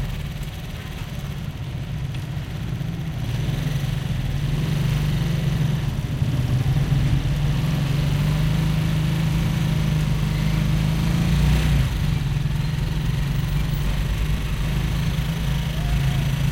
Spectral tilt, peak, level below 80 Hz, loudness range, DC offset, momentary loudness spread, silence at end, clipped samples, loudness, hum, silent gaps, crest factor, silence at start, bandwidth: -6.5 dB/octave; -8 dBFS; -28 dBFS; 6 LU; under 0.1%; 8 LU; 0 s; under 0.1%; -23 LUFS; none; none; 14 dB; 0 s; 16.5 kHz